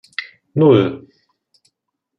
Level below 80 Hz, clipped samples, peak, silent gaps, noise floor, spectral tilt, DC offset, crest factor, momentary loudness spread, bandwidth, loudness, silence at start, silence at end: -62 dBFS; under 0.1%; -2 dBFS; none; -75 dBFS; -9 dB/octave; under 0.1%; 18 dB; 18 LU; 8.4 kHz; -15 LUFS; 0.2 s; 1.2 s